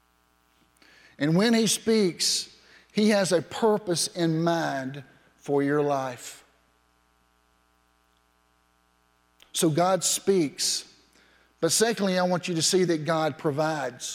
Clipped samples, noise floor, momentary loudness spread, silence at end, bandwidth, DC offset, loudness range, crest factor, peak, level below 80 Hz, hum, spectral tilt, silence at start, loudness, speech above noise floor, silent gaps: under 0.1%; -66 dBFS; 10 LU; 0 s; 16.5 kHz; under 0.1%; 7 LU; 18 dB; -10 dBFS; -70 dBFS; 60 Hz at -60 dBFS; -4 dB/octave; 1.2 s; -25 LUFS; 42 dB; none